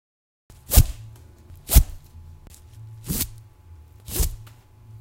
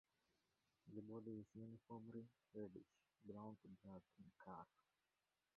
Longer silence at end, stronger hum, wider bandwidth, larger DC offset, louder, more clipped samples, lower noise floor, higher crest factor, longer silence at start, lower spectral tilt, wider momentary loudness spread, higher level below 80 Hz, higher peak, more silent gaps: second, 0.05 s vs 0.9 s; neither; first, 16.5 kHz vs 5.2 kHz; neither; first, -23 LUFS vs -60 LUFS; neither; second, -47 dBFS vs under -90 dBFS; first, 24 dB vs 18 dB; second, 0.7 s vs 0.85 s; second, -4 dB/octave vs -9 dB/octave; first, 25 LU vs 8 LU; first, -26 dBFS vs -88 dBFS; first, 0 dBFS vs -42 dBFS; neither